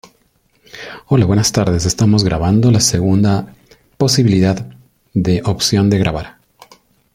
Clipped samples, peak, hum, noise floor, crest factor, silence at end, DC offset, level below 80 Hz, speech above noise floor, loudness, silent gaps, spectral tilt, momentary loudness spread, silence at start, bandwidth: under 0.1%; 0 dBFS; none; -58 dBFS; 14 dB; 0.85 s; under 0.1%; -38 dBFS; 45 dB; -14 LUFS; none; -5.5 dB/octave; 17 LU; 0.75 s; 16 kHz